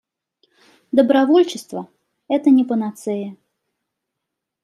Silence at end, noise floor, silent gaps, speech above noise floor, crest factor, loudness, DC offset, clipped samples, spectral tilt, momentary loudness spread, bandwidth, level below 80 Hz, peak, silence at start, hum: 1.3 s; -81 dBFS; none; 64 dB; 18 dB; -17 LUFS; under 0.1%; under 0.1%; -5.5 dB/octave; 17 LU; 12.5 kHz; -74 dBFS; -2 dBFS; 0.95 s; none